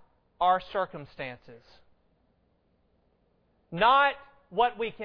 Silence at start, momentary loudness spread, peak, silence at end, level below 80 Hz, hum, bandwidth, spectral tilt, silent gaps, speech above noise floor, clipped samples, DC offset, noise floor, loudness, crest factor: 0.4 s; 18 LU; -10 dBFS; 0 s; -62 dBFS; none; 5.4 kHz; -6.5 dB/octave; none; 42 dB; under 0.1%; under 0.1%; -70 dBFS; -26 LUFS; 22 dB